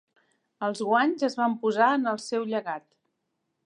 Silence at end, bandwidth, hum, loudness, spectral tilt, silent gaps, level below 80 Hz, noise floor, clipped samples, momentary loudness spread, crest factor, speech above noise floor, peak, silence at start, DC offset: 0.85 s; 10.5 kHz; none; -26 LUFS; -4.5 dB/octave; none; -84 dBFS; -79 dBFS; under 0.1%; 10 LU; 20 dB; 53 dB; -8 dBFS; 0.6 s; under 0.1%